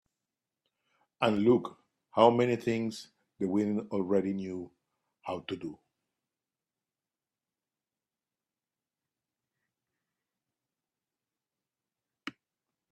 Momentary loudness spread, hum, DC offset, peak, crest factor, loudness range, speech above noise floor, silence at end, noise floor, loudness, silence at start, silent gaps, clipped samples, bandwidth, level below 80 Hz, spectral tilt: 21 LU; none; under 0.1%; -8 dBFS; 26 dB; 17 LU; over 61 dB; 0.6 s; under -90 dBFS; -30 LUFS; 1.2 s; none; under 0.1%; 12.5 kHz; -74 dBFS; -7 dB/octave